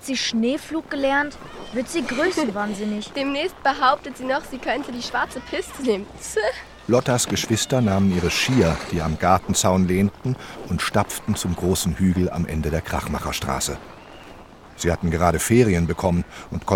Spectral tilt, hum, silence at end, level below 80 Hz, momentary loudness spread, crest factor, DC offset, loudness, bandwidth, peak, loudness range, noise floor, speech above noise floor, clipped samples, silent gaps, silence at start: -4.5 dB/octave; none; 0 s; -40 dBFS; 10 LU; 20 dB; under 0.1%; -22 LUFS; 18 kHz; -2 dBFS; 4 LU; -43 dBFS; 21 dB; under 0.1%; none; 0 s